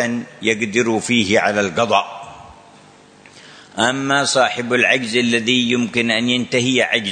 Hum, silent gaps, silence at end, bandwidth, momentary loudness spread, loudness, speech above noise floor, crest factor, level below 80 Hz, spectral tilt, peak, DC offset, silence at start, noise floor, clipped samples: none; none; 0 s; 9.6 kHz; 6 LU; -16 LUFS; 29 dB; 18 dB; -58 dBFS; -3.5 dB/octave; 0 dBFS; under 0.1%; 0 s; -46 dBFS; under 0.1%